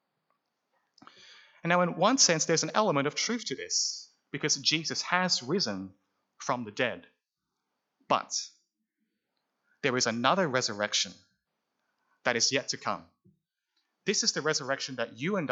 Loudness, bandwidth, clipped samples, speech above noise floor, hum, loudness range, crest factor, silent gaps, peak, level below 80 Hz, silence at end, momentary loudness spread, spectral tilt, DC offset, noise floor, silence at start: -28 LUFS; 8.4 kHz; under 0.1%; 56 dB; none; 8 LU; 24 dB; none; -8 dBFS; -84 dBFS; 0 s; 10 LU; -2.5 dB/octave; under 0.1%; -85 dBFS; 1.3 s